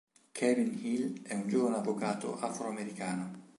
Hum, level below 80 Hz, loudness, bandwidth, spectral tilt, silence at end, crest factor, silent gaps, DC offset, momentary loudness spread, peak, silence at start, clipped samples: none; -82 dBFS; -34 LUFS; 11.5 kHz; -5.5 dB/octave; 0.1 s; 18 dB; none; under 0.1%; 8 LU; -16 dBFS; 0.35 s; under 0.1%